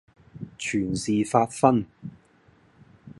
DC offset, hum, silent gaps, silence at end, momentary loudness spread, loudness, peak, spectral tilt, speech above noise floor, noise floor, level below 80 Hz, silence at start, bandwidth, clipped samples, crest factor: under 0.1%; none; none; 0.05 s; 22 LU; -24 LUFS; -2 dBFS; -5.5 dB/octave; 35 dB; -59 dBFS; -56 dBFS; 0.35 s; 11.5 kHz; under 0.1%; 24 dB